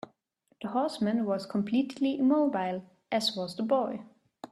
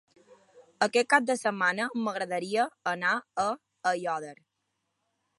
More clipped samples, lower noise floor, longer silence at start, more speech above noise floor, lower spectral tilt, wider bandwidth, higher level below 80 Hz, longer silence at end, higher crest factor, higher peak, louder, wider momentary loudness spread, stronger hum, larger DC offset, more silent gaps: neither; second, -72 dBFS vs -81 dBFS; first, 0.6 s vs 0.3 s; second, 43 dB vs 52 dB; first, -5.5 dB/octave vs -3.5 dB/octave; first, 13 kHz vs 11.5 kHz; about the same, -76 dBFS vs -80 dBFS; second, 0.05 s vs 1.05 s; second, 16 dB vs 24 dB; second, -14 dBFS vs -6 dBFS; about the same, -30 LUFS vs -28 LUFS; first, 15 LU vs 8 LU; neither; neither; neither